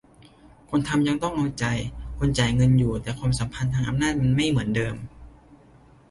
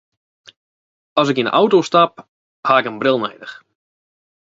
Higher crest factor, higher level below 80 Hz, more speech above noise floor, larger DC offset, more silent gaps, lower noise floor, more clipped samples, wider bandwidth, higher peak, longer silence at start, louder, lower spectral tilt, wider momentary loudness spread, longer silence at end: about the same, 20 dB vs 20 dB; first, -40 dBFS vs -66 dBFS; second, 30 dB vs over 74 dB; neither; second, none vs 2.28-2.63 s; second, -53 dBFS vs under -90 dBFS; neither; first, 11.5 kHz vs 7.8 kHz; second, -6 dBFS vs 0 dBFS; second, 0.7 s vs 1.15 s; second, -24 LUFS vs -16 LUFS; about the same, -6 dB/octave vs -5 dB/octave; second, 9 LU vs 13 LU; second, 0.55 s vs 0.95 s